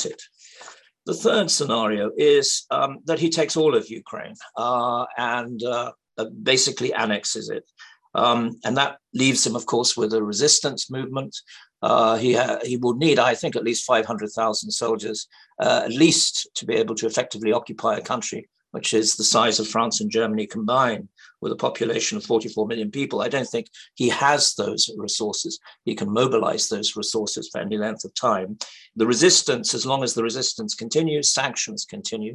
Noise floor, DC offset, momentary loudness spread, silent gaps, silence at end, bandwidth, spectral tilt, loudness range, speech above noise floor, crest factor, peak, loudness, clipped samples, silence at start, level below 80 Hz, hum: -46 dBFS; under 0.1%; 13 LU; none; 0 s; 12.5 kHz; -3 dB/octave; 3 LU; 24 dB; 20 dB; -2 dBFS; -22 LUFS; under 0.1%; 0 s; -68 dBFS; none